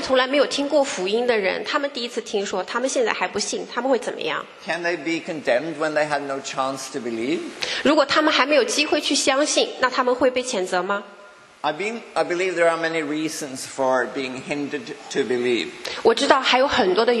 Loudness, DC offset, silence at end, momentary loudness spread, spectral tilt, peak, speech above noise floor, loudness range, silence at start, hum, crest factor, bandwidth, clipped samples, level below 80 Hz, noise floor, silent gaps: -22 LUFS; under 0.1%; 0 s; 10 LU; -2.5 dB/octave; 0 dBFS; 25 dB; 5 LU; 0 s; none; 22 dB; 12.5 kHz; under 0.1%; -62 dBFS; -46 dBFS; none